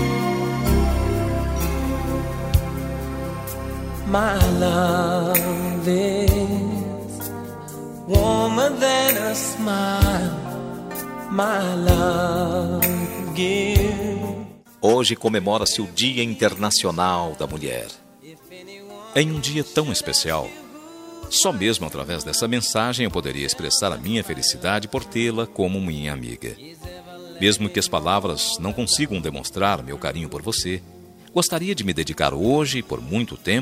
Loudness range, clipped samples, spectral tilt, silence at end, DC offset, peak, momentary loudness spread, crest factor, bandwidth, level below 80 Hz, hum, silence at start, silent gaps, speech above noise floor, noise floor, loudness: 4 LU; under 0.1%; -4 dB/octave; 0 s; under 0.1%; 0 dBFS; 12 LU; 22 dB; 16 kHz; -34 dBFS; none; 0 s; none; 24 dB; -46 dBFS; -22 LUFS